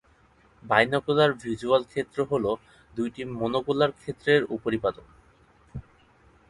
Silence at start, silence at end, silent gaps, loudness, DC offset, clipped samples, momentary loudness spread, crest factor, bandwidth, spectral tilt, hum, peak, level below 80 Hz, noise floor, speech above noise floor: 0.65 s; 0.7 s; none; -26 LUFS; under 0.1%; under 0.1%; 14 LU; 22 dB; 11.5 kHz; -6 dB/octave; none; -6 dBFS; -56 dBFS; -60 dBFS; 34 dB